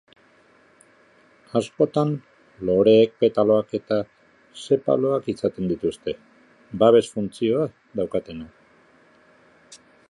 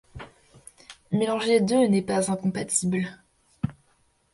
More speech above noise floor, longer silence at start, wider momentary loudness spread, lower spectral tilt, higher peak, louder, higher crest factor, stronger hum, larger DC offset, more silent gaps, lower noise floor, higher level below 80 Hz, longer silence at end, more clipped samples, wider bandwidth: second, 36 dB vs 42 dB; first, 1.55 s vs 0.15 s; second, 17 LU vs 23 LU; first, -7 dB/octave vs -5 dB/octave; first, -2 dBFS vs -10 dBFS; first, -22 LUFS vs -25 LUFS; about the same, 20 dB vs 16 dB; neither; neither; neither; second, -57 dBFS vs -66 dBFS; about the same, -58 dBFS vs -56 dBFS; second, 0.35 s vs 0.6 s; neither; about the same, 11.5 kHz vs 11.5 kHz